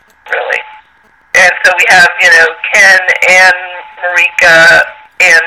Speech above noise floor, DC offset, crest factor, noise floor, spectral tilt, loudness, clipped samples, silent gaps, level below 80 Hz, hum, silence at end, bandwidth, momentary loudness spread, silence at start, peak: 40 dB; under 0.1%; 8 dB; -46 dBFS; -0.5 dB/octave; -5 LUFS; 2%; none; -46 dBFS; none; 0 s; over 20 kHz; 13 LU; 0.25 s; 0 dBFS